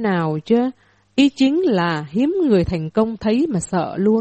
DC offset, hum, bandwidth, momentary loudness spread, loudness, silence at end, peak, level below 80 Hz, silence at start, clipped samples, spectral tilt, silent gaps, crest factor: under 0.1%; none; 8.4 kHz; 5 LU; -19 LUFS; 0 s; -4 dBFS; -44 dBFS; 0 s; under 0.1%; -6.5 dB/octave; none; 14 dB